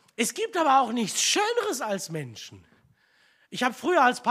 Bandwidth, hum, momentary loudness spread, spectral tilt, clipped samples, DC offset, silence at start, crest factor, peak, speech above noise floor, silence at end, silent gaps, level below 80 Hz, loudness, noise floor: 15.5 kHz; none; 16 LU; -2.5 dB/octave; under 0.1%; under 0.1%; 0.2 s; 18 dB; -8 dBFS; 38 dB; 0 s; none; -76 dBFS; -25 LUFS; -63 dBFS